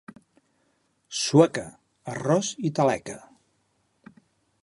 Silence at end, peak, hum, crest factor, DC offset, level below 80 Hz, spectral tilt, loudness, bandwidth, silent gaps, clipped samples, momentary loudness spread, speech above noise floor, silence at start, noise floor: 1.45 s; -4 dBFS; none; 24 dB; under 0.1%; -66 dBFS; -5 dB/octave; -24 LUFS; 11.5 kHz; none; under 0.1%; 22 LU; 47 dB; 1.1 s; -70 dBFS